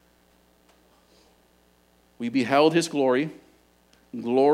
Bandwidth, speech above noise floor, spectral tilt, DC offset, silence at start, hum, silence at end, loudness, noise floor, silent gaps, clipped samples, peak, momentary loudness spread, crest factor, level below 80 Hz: 15.5 kHz; 40 dB; -5 dB/octave; under 0.1%; 2.2 s; 60 Hz at -55 dBFS; 0 s; -23 LUFS; -61 dBFS; none; under 0.1%; -6 dBFS; 15 LU; 20 dB; -70 dBFS